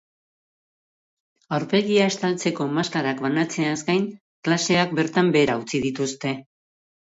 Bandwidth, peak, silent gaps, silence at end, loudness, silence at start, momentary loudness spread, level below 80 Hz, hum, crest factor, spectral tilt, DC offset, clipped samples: 8 kHz; -6 dBFS; 4.21-4.43 s; 0.75 s; -23 LUFS; 1.5 s; 9 LU; -62 dBFS; none; 16 dB; -5 dB/octave; under 0.1%; under 0.1%